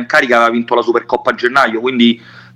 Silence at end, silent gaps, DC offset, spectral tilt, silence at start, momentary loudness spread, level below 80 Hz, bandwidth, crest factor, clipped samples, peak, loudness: 0.15 s; none; under 0.1%; -4.5 dB/octave; 0 s; 4 LU; -58 dBFS; 12 kHz; 14 dB; under 0.1%; 0 dBFS; -12 LUFS